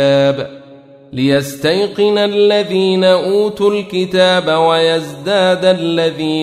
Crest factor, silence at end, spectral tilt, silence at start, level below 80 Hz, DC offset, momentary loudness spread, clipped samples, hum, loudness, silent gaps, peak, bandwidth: 12 dB; 0 s; -5.5 dB/octave; 0 s; -54 dBFS; under 0.1%; 6 LU; under 0.1%; none; -13 LUFS; none; 0 dBFS; 15.5 kHz